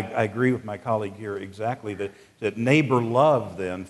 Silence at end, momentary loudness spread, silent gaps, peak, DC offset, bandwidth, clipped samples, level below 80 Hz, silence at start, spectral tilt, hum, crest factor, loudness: 0 s; 13 LU; none; -4 dBFS; under 0.1%; 12 kHz; under 0.1%; -64 dBFS; 0 s; -7 dB/octave; none; 20 dB; -24 LUFS